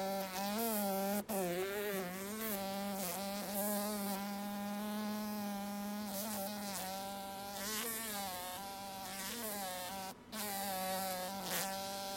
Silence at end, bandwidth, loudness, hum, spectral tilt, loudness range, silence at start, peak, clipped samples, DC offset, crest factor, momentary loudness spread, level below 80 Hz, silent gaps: 0 s; 16.5 kHz; -40 LUFS; none; -3.5 dB/octave; 3 LU; 0 s; -20 dBFS; under 0.1%; under 0.1%; 20 dB; 6 LU; -72 dBFS; none